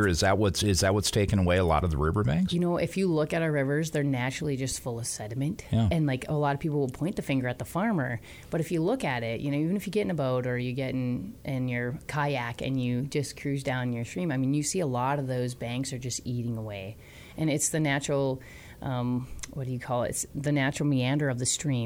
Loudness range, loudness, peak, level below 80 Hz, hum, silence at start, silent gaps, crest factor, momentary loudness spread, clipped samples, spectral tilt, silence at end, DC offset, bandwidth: 4 LU; -29 LUFS; -12 dBFS; -46 dBFS; none; 0 s; none; 16 dB; 8 LU; under 0.1%; -5 dB/octave; 0 s; under 0.1%; 19 kHz